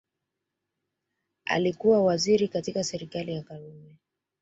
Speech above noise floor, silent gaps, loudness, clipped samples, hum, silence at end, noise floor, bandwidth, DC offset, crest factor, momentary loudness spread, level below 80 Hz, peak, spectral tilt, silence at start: 58 dB; none; -26 LUFS; under 0.1%; none; 0.6 s; -84 dBFS; 8 kHz; under 0.1%; 20 dB; 16 LU; -66 dBFS; -8 dBFS; -5 dB/octave; 1.45 s